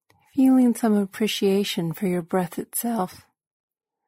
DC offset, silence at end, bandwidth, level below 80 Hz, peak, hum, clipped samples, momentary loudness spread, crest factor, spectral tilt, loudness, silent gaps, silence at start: under 0.1%; 0.9 s; 16 kHz; -68 dBFS; -10 dBFS; none; under 0.1%; 9 LU; 12 dB; -5.5 dB/octave; -23 LUFS; none; 0.35 s